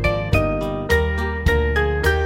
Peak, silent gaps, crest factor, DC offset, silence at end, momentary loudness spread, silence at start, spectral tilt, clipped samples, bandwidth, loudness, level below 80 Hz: -4 dBFS; none; 16 dB; under 0.1%; 0 s; 4 LU; 0 s; -6.5 dB/octave; under 0.1%; 16.5 kHz; -20 LUFS; -24 dBFS